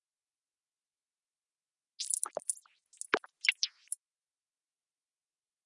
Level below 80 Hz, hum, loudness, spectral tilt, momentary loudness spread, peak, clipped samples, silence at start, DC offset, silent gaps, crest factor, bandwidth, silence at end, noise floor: -88 dBFS; none; -34 LUFS; 1.5 dB/octave; 12 LU; -10 dBFS; under 0.1%; 2 s; under 0.1%; none; 32 dB; 11.5 kHz; 2 s; under -90 dBFS